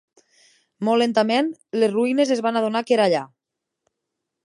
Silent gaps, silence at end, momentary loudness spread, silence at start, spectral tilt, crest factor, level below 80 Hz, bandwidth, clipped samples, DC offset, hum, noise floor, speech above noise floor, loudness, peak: none; 1.2 s; 7 LU; 0.8 s; -5 dB/octave; 16 dB; -78 dBFS; 11.5 kHz; under 0.1%; under 0.1%; none; -83 dBFS; 63 dB; -21 LUFS; -6 dBFS